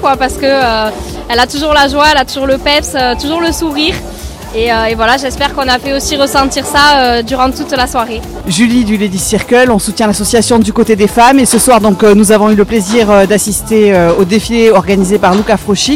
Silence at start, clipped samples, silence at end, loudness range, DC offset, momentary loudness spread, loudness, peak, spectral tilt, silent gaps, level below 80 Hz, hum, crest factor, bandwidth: 0 s; 0.5%; 0 s; 5 LU; under 0.1%; 7 LU; -9 LUFS; 0 dBFS; -4 dB/octave; none; -28 dBFS; none; 10 dB; 17 kHz